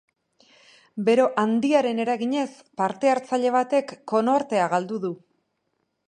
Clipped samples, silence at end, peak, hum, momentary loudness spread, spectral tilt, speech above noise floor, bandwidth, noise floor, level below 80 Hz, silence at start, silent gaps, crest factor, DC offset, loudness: under 0.1%; 0.9 s; -6 dBFS; none; 10 LU; -5.5 dB/octave; 52 dB; 10.5 kHz; -75 dBFS; -76 dBFS; 0.95 s; none; 18 dB; under 0.1%; -23 LUFS